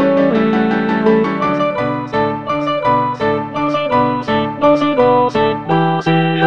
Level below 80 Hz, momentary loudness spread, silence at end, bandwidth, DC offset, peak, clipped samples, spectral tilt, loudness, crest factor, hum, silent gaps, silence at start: -48 dBFS; 5 LU; 0 s; 7.6 kHz; 0.4%; 0 dBFS; under 0.1%; -7.5 dB/octave; -15 LUFS; 14 dB; none; none; 0 s